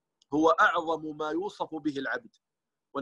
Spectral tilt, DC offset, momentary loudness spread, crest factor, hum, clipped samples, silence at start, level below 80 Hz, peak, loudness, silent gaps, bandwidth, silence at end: -5 dB/octave; under 0.1%; 13 LU; 18 dB; none; under 0.1%; 0.3 s; -70 dBFS; -10 dBFS; -28 LUFS; none; 8.2 kHz; 0 s